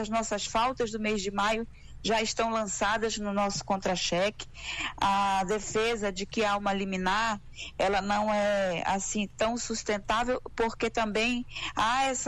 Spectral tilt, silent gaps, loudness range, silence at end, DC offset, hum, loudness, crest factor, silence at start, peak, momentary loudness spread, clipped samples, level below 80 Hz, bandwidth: -3 dB/octave; none; 1 LU; 0 s; under 0.1%; none; -29 LUFS; 12 dB; 0 s; -18 dBFS; 5 LU; under 0.1%; -48 dBFS; 12.5 kHz